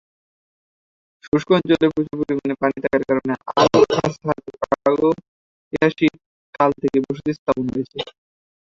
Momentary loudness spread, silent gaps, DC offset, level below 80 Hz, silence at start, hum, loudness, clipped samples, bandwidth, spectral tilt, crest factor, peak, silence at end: 10 LU; 1.28-1.32 s, 5.28-5.71 s, 6.26-6.53 s, 7.39-7.46 s; under 0.1%; -54 dBFS; 1.25 s; none; -20 LUFS; under 0.1%; 7.6 kHz; -6.5 dB/octave; 18 dB; -2 dBFS; 0.55 s